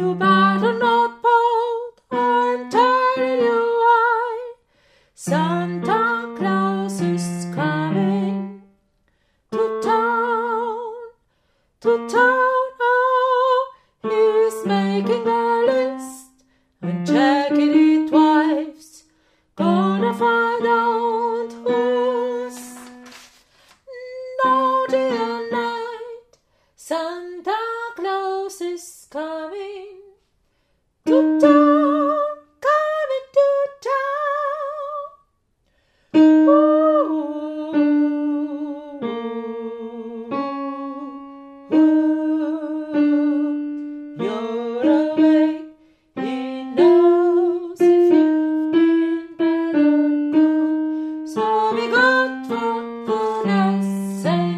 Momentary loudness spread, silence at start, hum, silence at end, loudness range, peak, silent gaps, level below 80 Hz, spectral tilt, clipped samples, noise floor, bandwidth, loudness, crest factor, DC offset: 15 LU; 0 s; none; 0 s; 7 LU; -2 dBFS; none; -68 dBFS; -6.5 dB/octave; under 0.1%; -66 dBFS; 12.5 kHz; -19 LUFS; 18 dB; under 0.1%